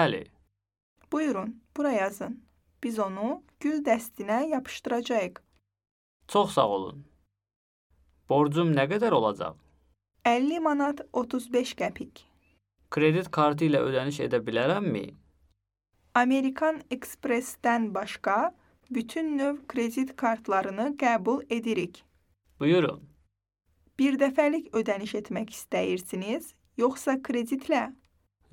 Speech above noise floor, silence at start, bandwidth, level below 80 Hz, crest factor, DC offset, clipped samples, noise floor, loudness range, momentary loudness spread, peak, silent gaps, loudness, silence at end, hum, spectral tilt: 48 dB; 0 s; 17.5 kHz; -68 dBFS; 22 dB; under 0.1%; under 0.1%; -75 dBFS; 3 LU; 11 LU; -6 dBFS; 0.83-0.96 s, 5.91-6.20 s, 7.56-7.90 s; -28 LUFS; 0.6 s; none; -6 dB/octave